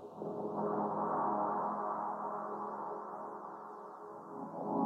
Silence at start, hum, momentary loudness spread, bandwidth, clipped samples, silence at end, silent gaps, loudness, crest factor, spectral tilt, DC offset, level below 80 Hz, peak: 0 s; none; 13 LU; 9.6 kHz; under 0.1%; 0 s; none; -39 LUFS; 18 dB; -9.5 dB/octave; under 0.1%; under -90 dBFS; -22 dBFS